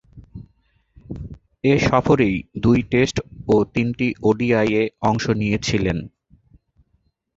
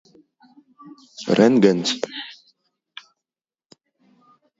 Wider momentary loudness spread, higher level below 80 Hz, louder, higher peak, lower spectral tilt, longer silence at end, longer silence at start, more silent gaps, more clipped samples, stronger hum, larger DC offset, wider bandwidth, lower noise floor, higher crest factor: second, 18 LU vs 28 LU; first, -42 dBFS vs -70 dBFS; about the same, -20 LUFS vs -18 LUFS; about the same, -2 dBFS vs 0 dBFS; about the same, -6.5 dB/octave vs -5.5 dB/octave; second, 1.3 s vs 2.25 s; second, 0.15 s vs 1.2 s; neither; neither; neither; neither; about the same, 8 kHz vs 8 kHz; second, -66 dBFS vs under -90 dBFS; about the same, 18 dB vs 22 dB